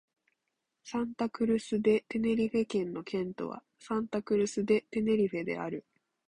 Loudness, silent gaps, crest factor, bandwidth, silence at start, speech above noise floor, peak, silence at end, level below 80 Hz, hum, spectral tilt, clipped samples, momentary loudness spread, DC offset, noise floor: -32 LUFS; none; 16 dB; 11 kHz; 0.85 s; 53 dB; -16 dBFS; 0.5 s; -66 dBFS; none; -6 dB/octave; under 0.1%; 10 LU; under 0.1%; -84 dBFS